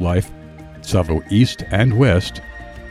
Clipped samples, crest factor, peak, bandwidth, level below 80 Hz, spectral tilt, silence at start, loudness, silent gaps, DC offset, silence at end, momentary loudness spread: under 0.1%; 14 dB; -4 dBFS; 14 kHz; -34 dBFS; -6.5 dB/octave; 0 s; -17 LUFS; none; under 0.1%; 0 s; 20 LU